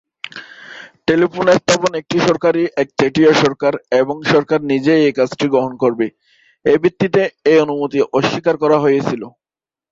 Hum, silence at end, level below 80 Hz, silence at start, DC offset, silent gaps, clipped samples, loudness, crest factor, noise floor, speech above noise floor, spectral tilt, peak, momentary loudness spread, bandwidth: none; 0.65 s; -54 dBFS; 0.35 s; under 0.1%; none; under 0.1%; -15 LUFS; 16 dB; under -90 dBFS; over 76 dB; -5.5 dB/octave; 0 dBFS; 10 LU; 8.2 kHz